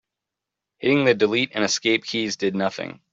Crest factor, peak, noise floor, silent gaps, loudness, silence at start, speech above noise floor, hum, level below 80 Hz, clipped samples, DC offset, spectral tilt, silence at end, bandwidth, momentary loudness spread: 18 dB; -4 dBFS; -85 dBFS; none; -21 LUFS; 0.8 s; 64 dB; none; -66 dBFS; under 0.1%; under 0.1%; -3.5 dB/octave; 0.2 s; 8 kHz; 8 LU